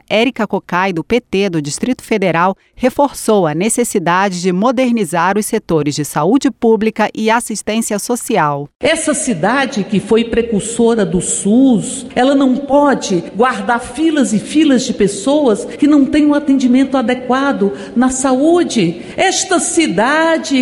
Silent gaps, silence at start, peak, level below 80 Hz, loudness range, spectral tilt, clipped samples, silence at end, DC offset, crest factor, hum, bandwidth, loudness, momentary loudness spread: 8.76-8.80 s; 0.1 s; -2 dBFS; -44 dBFS; 2 LU; -4.5 dB/octave; under 0.1%; 0 s; under 0.1%; 12 dB; none; 16 kHz; -14 LUFS; 5 LU